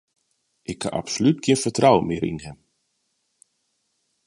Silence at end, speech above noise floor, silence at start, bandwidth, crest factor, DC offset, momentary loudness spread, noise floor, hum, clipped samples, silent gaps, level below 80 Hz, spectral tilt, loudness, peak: 1.75 s; 52 dB; 0.7 s; 11.5 kHz; 22 dB; under 0.1%; 18 LU; -73 dBFS; none; under 0.1%; none; -54 dBFS; -5 dB/octave; -21 LUFS; -2 dBFS